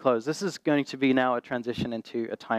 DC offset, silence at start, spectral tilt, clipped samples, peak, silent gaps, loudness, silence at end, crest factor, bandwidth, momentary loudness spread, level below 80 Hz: under 0.1%; 0 s; -5.5 dB/octave; under 0.1%; -10 dBFS; none; -28 LUFS; 0 s; 16 dB; 13 kHz; 9 LU; -66 dBFS